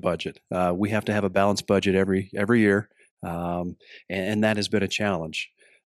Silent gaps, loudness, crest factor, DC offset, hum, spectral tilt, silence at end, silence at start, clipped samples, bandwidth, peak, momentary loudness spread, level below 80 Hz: 3.11-3.17 s; -25 LUFS; 18 dB; under 0.1%; none; -5.5 dB/octave; 0.4 s; 0.05 s; under 0.1%; 13.5 kHz; -6 dBFS; 11 LU; -58 dBFS